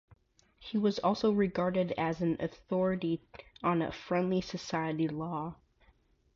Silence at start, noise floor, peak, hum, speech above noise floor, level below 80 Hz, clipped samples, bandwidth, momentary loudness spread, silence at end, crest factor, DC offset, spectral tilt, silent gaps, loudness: 0.1 s; -67 dBFS; -16 dBFS; none; 36 dB; -62 dBFS; under 0.1%; 7.4 kHz; 8 LU; 0.8 s; 16 dB; under 0.1%; -7 dB/octave; none; -32 LUFS